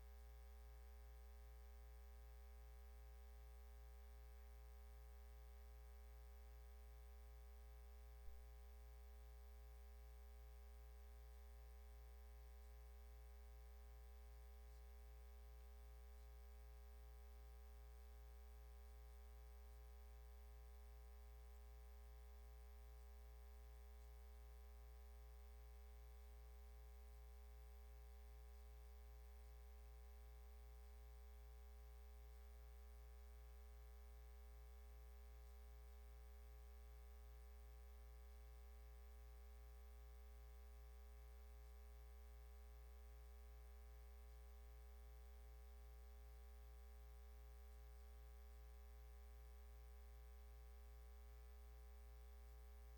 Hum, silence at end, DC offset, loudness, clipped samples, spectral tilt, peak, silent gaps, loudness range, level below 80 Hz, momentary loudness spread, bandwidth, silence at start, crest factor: 60 Hz at -60 dBFS; 0 s; under 0.1%; -64 LUFS; under 0.1%; -5.5 dB/octave; -44 dBFS; none; 0 LU; -60 dBFS; 0 LU; 19 kHz; 0 s; 16 dB